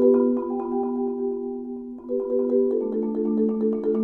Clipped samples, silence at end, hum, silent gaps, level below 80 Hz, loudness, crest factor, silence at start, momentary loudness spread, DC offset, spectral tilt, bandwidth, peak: under 0.1%; 0 s; none; none; -60 dBFS; -25 LUFS; 16 dB; 0 s; 9 LU; under 0.1%; -12 dB/octave; 2.6 kHz; -8 dBFS